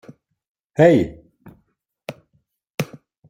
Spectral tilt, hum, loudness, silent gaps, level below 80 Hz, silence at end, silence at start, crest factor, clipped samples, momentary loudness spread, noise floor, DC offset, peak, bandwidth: -7 dB/octave; none; -19 LUFS; 2.74-2.78 s; -54 dBFS; 0.45 s; 0.8 s; 20 dB; under 0.1%; 23 LU; -68 dBFS; under 0.1%; -2 dBFS; 16.5 kHz